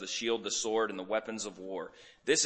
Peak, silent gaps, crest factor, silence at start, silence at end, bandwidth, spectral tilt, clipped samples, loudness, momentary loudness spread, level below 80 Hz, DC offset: -14 dBFS; none; 20 dB; 0 s; 0 s; 8.8 kHz; -1.5 dB/octave; under 0.1%; -34 LUFS; 11 LU; -74 dBFS; under 0.1%